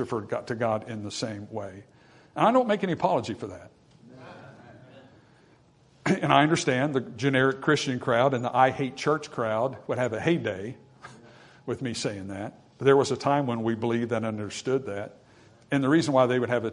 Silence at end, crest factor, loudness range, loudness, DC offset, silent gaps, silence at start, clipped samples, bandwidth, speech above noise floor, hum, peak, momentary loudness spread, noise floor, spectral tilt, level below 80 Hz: 0 s; 24 dB; 6 LU; -26 LUFS; under 0.1%; none; 0 s; under 0.1%; 11 kHz; 33 dB; none; -4 dBFS; 16 LU; -59 dBFS; -5.5 dB/octave; -66 dBFS